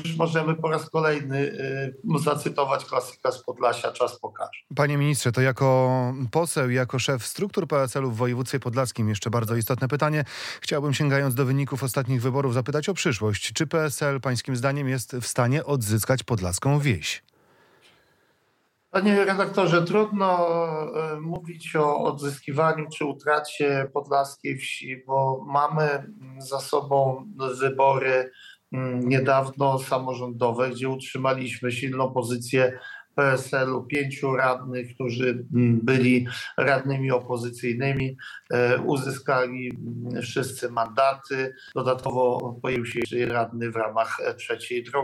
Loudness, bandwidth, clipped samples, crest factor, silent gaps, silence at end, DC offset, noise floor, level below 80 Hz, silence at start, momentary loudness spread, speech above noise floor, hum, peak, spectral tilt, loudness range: -25 LUFS; 16.5 kHz; under 0.1%; 16 dB; none; 0 s; under 0.1%; -68 dBFS; -62 dBFS; 0 s; 9 LU; 44 dB; none; -8 dBFS; -5.5 dB/octave; 3 LU